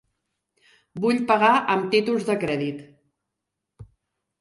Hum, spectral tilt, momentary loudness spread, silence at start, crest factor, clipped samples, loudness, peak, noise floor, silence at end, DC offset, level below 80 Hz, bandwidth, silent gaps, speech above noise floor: none; -5.5 dB/octave; 13 LU; 0.95 s; 18 dB; under 0.1%; -22 LUFS; -6 dBFS; -83 dBFS; 0.55 s; under 0.1%; -64 dBFS; 11.5 kHz; none; 62 dB